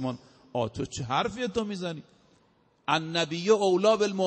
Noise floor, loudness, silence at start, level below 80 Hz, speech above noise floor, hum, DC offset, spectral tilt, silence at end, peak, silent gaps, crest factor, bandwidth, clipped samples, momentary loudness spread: -65 dBFS; -28 LUFS; 0 s; -60 dBFS; 38 dB; none; under 0.1%; -5 dB/octave; 0 s; -10 dBFS; none; 18 dB; 8.4 kHz; under 0.1%; 14 LU